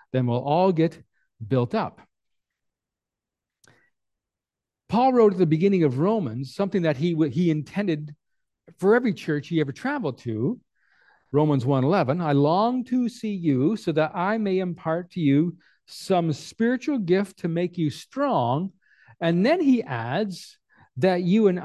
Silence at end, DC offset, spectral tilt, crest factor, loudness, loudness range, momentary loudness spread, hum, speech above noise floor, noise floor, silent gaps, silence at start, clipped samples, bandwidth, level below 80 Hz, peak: 0 s; under 0.1%; -8 dB/octave; 18 dB; -24 LUFS; 4 LU; 8 LU; none; 66 dB; -89 dBFS; none; 0.15 s; under 0.1%; 12.5 kHz; -66 dBFS; -6 dBFS